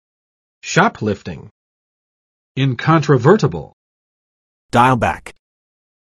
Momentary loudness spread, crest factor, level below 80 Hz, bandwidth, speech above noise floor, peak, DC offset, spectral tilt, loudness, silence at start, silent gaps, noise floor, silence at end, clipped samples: 18 LU; 18 dB; -48 dBFS; 12 kHz; over 75 dB; 0 dBFS; under 0.1%; -6 dB/octave; -15 LUFS; 0.65 s; 1.51-2.55 s, 3.73-4.69 s; under -90 dBFS; 0.9 s; under 0.1%